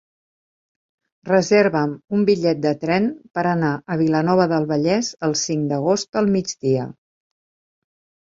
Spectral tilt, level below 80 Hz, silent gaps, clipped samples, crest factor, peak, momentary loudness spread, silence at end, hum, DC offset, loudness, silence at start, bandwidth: -5.5 dB/octave; -60 dBFS; 6.09-6.13 s; under 0.1%; 18 dB; -2 dBFS; 6 LU; 1.4 s; none; under 0.1%; -20 LUFS; 1.25 s; 7.8 kHz